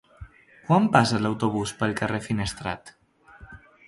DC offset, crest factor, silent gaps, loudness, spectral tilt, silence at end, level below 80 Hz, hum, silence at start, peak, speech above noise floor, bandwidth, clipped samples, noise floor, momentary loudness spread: under 0.1%; 24 dB; none; -24 LUFS; -5.5 dB/octave; 0.3 s; -50 dBFS; none; 0.2 s; -2 dBFS; 27 dB; 11.5 kHz; under 0.1%; -50 dBFS; 14 LU